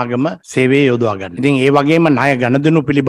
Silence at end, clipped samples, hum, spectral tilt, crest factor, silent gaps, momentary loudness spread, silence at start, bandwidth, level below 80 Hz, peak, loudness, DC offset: 0 s; under 0.1%; none; -7 dB/octave; 12 dB; none; 7 LU; 0 s; 11.5 kHz; -52 dBFS; 0 dBFS; -13 LUFS; under 0.1%